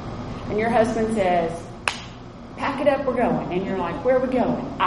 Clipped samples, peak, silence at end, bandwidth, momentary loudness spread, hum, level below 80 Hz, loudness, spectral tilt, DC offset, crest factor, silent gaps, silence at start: under 0.1%; -2 dBFS; 0 s; 11.5 kHz; 12 LU; none; -44 dBFS; -23 LUFS; -6 dB/octave; under 0.1%; 20 dB; none; 0 s